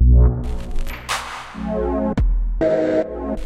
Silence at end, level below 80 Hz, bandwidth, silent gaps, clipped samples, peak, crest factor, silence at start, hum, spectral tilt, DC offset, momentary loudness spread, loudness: 0 s; -20 dBFS; 13 kHz; none; under 0.1%; -4 dBFS; 14 dB; 0 s; none; -7 dB/octave; under 0.1%; 13 LU; -21 LUFS